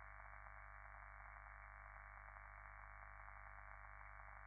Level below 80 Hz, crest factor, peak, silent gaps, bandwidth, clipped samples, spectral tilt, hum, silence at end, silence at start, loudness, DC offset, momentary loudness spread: -62 dBFS; 18 dB; -40 dBFS; none; 2.4 kHz; under 0.1%; 1 dB/octave; 50 Hz at -65 dBFS; 0 s; 0 s; -59 LUFS; under 0.1%; 0 LU